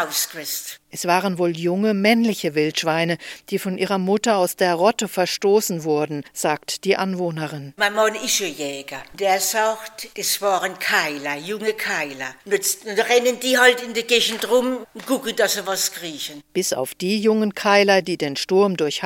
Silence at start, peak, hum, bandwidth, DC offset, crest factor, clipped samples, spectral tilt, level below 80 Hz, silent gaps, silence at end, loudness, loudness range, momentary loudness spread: 0 s; -2 dBFS; none; 17 kHz; under 0.1%; 20 dB; under 0.1%; -3 dB/octave; -66 dBFS; none; 0 s; -20 LUFS; 3 LU; 10 LU